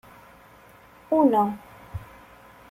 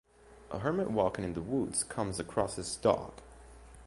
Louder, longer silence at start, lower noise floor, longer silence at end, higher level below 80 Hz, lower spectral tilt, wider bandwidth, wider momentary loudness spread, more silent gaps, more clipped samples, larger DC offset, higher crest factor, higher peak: first, -22 LUFS vs -33 LUFS; first, 1.1 s vs 0.25 s; about the same, -51 dBFS vs -53 dBFS; first, 0.65 s vs 0 s; about the same, -54 dBFS vs -54 dBFS; first, -8.5 dB/octave vs -4.5 dB/octave; first, 15.5 kHz vs 11.5 kHz; first, 21 LU vs 8 LU; neither; neither; neither; second, 18 dB vs 24 dB; about the same, -8 dBFS vs -10 dBFS